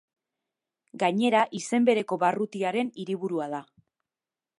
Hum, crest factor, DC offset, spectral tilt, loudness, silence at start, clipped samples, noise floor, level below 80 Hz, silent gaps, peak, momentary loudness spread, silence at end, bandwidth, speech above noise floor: none; 20 dB; under 0.1%; -5 dB/octave; -26 LUFS; 0.95 s; under 0.1%; under -90 dBFS; -80 dBFS; none; -8 dBFS; 9 LU; 1 s; 11.5 kHz; over 64 dB